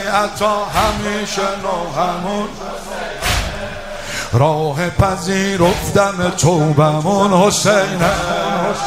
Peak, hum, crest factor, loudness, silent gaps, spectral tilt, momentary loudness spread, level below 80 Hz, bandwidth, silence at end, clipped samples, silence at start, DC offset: 0 dBFS; none; 16 dB; -16 LUFS; none; -4.5 dB/octave; 11 LU; -32 dBFS; 16 kHz; 0 s; under 0.1%; 0 s; under 0.1%